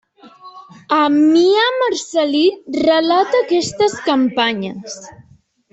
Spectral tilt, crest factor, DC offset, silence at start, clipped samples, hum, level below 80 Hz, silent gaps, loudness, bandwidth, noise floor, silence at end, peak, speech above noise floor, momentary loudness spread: -4 dB/octave; 14 dB; under 0.1%; 0.25 s; under 0.1%; none; -60 dBFS; none; -15 LUFS; 8.2 kHz; -51 dBFS; 0.6 s; -2 dBFS; 36 dB; 11 LU